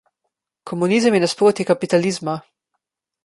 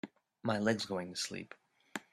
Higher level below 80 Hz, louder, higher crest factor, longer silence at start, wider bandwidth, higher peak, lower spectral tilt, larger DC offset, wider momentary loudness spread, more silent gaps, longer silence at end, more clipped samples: first, -64 dBFS vs -76 dBFS; first, -18 LUFS vs -37 LUFS; second, 16 dB vs 22 dB; first, 0.65 s vs 0.05 s; second, 11.5 kHz vs 14.5 kHz; first, -4 dBFS vs -16 dBFS; about the same, -5 dB/octave vs -4 dB/octave; neither; second, 12 LU vs 19 LU; neither; first, 0.85 s vs 0.1 s; neither